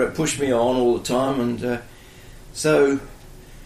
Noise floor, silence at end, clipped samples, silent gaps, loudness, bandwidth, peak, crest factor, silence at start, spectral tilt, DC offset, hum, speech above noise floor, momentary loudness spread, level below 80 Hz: -43 dBFS; 0 s; under 0.1%; none; -21 LUFS; 15.5 kHz; -8 dBFS; 14 dB; 0 s; -5 dB/octave; under 0.1%; none; 22 dB; 10 LU; -44 dBFS